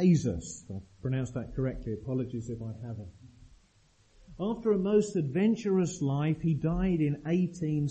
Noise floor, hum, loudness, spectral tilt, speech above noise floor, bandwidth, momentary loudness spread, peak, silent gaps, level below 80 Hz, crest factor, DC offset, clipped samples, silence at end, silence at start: -65 dBFS; none; -31 LUFS; -7.5 dB/octave; 35 dB; 8.4 kHz; 13 LU; -14 dBFS; none; -50 dBFS; 16 dB; under 0.1%; under 0.1%; 0 s; 0 s